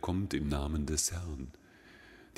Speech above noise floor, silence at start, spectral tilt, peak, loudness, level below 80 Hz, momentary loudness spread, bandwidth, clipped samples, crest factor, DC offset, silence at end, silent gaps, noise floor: 23 dB; 0 s; -4.5 dB/octave; -16 dBFS; -34 LUFS; -44 dBFS; 20 LU; 16 kHz; under 0.1%; 20 dB; under 0.1%; 0.15 s; none; -57 dBFS